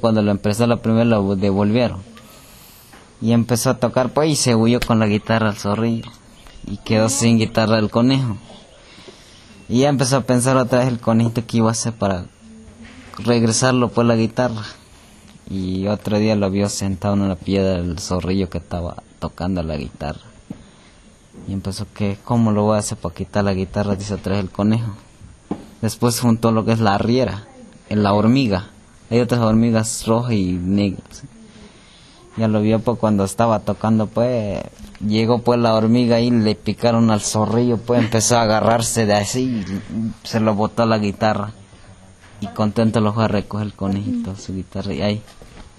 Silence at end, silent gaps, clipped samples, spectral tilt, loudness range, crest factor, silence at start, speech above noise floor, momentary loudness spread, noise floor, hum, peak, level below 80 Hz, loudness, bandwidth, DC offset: 0.15 s; none; under 0.1%; -5.5 dB/octave; 5 LU; 16 dB; 0 s; 29 dB; 13 LU; -47 dBFS; none; -2 dBFS; -44 dBFS; -18 LUFS; 13.5 kHz; under 0.1%